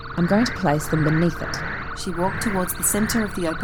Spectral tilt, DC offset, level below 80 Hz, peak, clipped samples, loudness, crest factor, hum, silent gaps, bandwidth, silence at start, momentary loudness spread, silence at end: -5 dB/octave; under 0.1%; -36 dBFS; -6 dBFS; under 0.1%; -22 LUFS; 16 dB; none; none; over 20 kHz; 0 s; 8 LU; 0 s